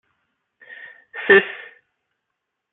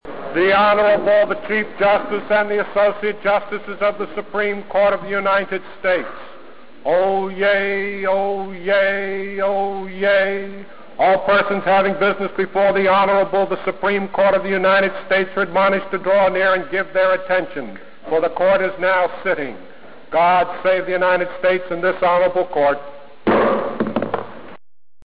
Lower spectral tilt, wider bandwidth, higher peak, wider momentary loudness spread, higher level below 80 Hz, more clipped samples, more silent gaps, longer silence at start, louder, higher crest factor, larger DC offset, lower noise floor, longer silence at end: about the same, -8.5 dB/octave vs -9.5 dB/octave; second, 4 kHz vs 5.2 kHz; first, -2 dBFS vs -8 dBFS; first, 25 LU vs 9 LU; second, -70 dBFS vs -52 dBFS; neither; neither; first, 1.15 s vs 0 s; about the same, -16 LUFS vs -18 LUFS; first, 22 dB vs 10 dB; second, under 0.1% vs 2%; first, -79 dBFS vs -43 dBFS; first, 1.15 s vs 0.5 s